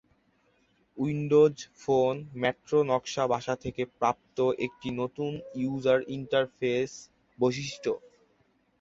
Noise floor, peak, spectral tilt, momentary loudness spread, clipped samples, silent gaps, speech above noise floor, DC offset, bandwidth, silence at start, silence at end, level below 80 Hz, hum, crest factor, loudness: -69 dBFS; -10 dBFS; -6 dB/octave; 9 LU; under 0.1%; none; 41 dB; under 0.1%; 7.8 kHz; 0.95 s; 0.8 s; -64 dBFS; none; 18 dB; -29 LUFS